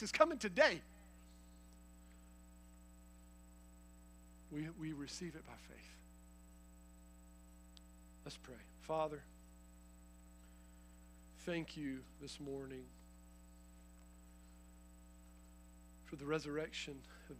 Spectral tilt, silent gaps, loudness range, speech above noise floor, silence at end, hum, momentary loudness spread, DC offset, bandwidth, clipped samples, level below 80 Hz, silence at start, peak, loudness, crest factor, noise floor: -4.5 dB/octave; none; 12 LU; 19 dB; 0 s; 60 Hz at -60 dBFS; 21 LU; under 0.1%; 15.5 kHz; under 0.1%; -62 dBFS; 0 s; -16 dBFS; -42 LUFS; 30 dB; -61 dBFS